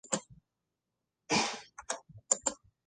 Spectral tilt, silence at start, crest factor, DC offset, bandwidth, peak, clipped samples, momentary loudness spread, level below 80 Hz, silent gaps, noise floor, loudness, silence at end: -1.5 dB/octave; 0.05 s; 26 dB; under 0.1%; 10.5 kHz; -12 dBFS; under 0.1%; 10 LU; -70 dBFS; none; -87 dBFS; -33 LUFS; 0.35 s